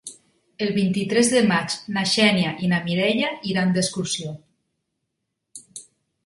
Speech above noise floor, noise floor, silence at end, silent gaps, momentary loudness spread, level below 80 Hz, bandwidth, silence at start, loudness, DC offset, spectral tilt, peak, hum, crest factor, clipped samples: 58 dB; -79 dBFS; 0.45 s; none; 21 LU; -62 dBFS; 11.5 kHz; 0.05 s; -21 LUFS; under 0.1%; -4.5 dB/octave; -4 dBFS; none; 20 dB; under 0.1%